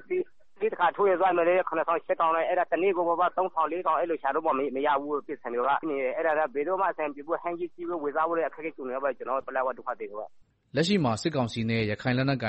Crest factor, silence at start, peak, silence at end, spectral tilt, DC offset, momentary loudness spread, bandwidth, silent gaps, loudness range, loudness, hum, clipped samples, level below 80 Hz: 16 dB; 0.1 s; -12 dBFS; 0 s; -6 dB/octave; 0.3%; 9 LU; 8.2 kHz; none; 5 LU; -28 LUFS; none; under 0.1%; -64 dBFS